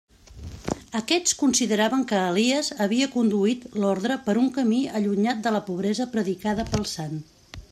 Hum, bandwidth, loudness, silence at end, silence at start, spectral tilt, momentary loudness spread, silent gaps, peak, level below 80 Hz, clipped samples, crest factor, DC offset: none; 14 kHz; -24 LUFS; 0.1 s; 0.3 s; -4 dB/octave; 11 LU; none; -8 dBFS; -50 dBFS; under 0.1%; 16 dB; under 0.1%